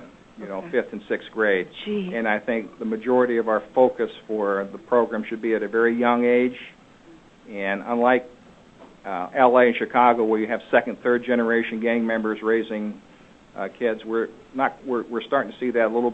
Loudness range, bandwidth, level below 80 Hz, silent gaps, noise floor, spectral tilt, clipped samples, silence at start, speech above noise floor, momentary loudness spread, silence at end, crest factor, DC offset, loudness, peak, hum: 6 LU; 7.8 kHz; -64 dBFS; none; -50 dBFS; -7 dB/octave; under 0.1%; 0 s; 28 dB; 12 LU; 0 s; 22 dB; under 0.1%; -22 LUFS; -2 dBFS; none